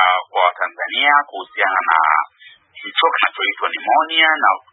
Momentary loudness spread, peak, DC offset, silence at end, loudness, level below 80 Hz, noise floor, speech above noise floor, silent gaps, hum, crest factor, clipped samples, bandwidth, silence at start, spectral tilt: 9 LU; 0 dBFS; under 0.1%; 0.15 s; -16 LUFS; -88 dBFS; -41 dBFS; 24 dB; none; none; 18 dB; under 0.1%; 4.1 kHz; 0 s; -4 dB/octave